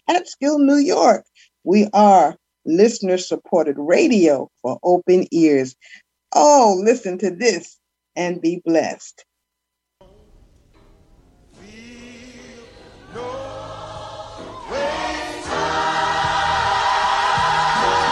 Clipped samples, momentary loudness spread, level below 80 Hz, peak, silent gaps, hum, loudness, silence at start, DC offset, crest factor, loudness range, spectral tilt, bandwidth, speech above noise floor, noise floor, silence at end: under 0.1%; 19 LU; -50 dBFS; -2 dBFS; none; none; -17 LUFS; 0.1 s; under 0.1%; 18 dB; 19 LU; -4.5 dB/octave; 11 kHz; 63 dB; -79 dBFS; 0 s